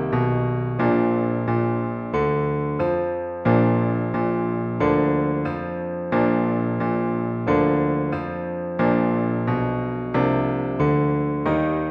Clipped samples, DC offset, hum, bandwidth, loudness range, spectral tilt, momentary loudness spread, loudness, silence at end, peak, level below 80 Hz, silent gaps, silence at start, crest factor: under 0.1%; under 0.1%; none; 5.4 kHz; 1 LU; -10.5 dB/octave; 6 LU; -22 LUFS; 0 s; -6 dBFS; -46 dBFS; none; 0 s; 16 dB